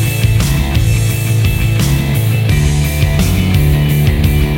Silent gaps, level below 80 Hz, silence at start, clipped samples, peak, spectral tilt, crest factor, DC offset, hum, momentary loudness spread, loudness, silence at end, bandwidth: none; -18 dBFS; 0 s; under 0.1%; -2 dBFS; -5.5 dB/octave; 10 dB; under 0.1%; none; 2 LU; -13 LUFS; 0 s; 17 kHz